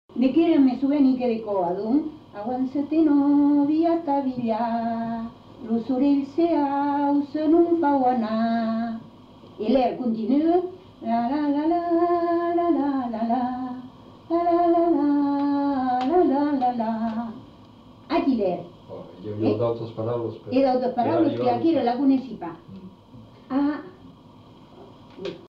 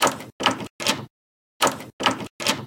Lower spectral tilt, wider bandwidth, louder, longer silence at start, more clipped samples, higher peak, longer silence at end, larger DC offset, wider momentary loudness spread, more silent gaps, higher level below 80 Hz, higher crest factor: first, -9 dB/octave vs -2 dB/octave; second, 5.6 kHz vs 17 kHz; about the same, -23 LUFS vs -24 LUFS; first, 0.15 s vs 0 s; neither; second, -8 dBFS vs -2 dBFS; about the same, 0 s vs 0 s; neither; first, 15 LU vs 2 LU; second, none vs 0.32-0.39 s, 0.70-0.79 s, 1.10-1.60 s, 1.93-1.99 s, 2.30-2.39 s; about the same, -60 dBFS vs -62 dBFS; second, 14 dB vs 24 dB